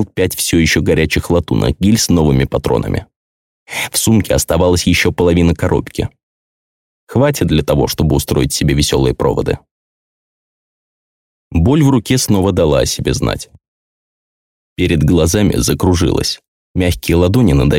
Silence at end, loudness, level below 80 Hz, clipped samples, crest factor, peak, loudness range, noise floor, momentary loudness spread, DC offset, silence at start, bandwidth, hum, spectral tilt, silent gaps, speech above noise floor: 0 s; -14 LUFS; -30 dBFS; under 0.1%; 12 dB; -2 dBFS; 3 LU; under -90 dBFS; 9 LU; 0.2%; 0 s; 17 kHz; none; -5 dB/octave; 3.16-3.66 s, 6.23-7.07 s, 9.71-11.51 s, 13.68-14.76 s, 16.48-16.74 s; over 77 dB